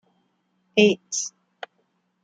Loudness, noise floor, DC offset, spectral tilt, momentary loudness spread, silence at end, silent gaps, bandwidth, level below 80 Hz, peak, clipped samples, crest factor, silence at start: -22 LUFS; -70 dBFS; under 0.1%; -3.5 dB/octave; 23 LU; 0.95 s; none; 9.4 kHz; -72 dBFS; -4 dBFS; under 0.1%; 22 dB; 0.75 s